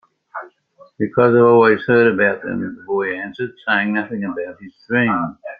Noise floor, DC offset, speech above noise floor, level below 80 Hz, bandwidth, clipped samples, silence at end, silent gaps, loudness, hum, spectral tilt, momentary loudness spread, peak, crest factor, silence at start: -50 dBFS; under 0.1%; 33 dB; -60 dBFS; 5 kHz; under 0.1%; 0.05 s; none; -17 LUFS; none; -9.5 dB/octave; 17 LU; -2 dBFS; 16 dB; 0.35 s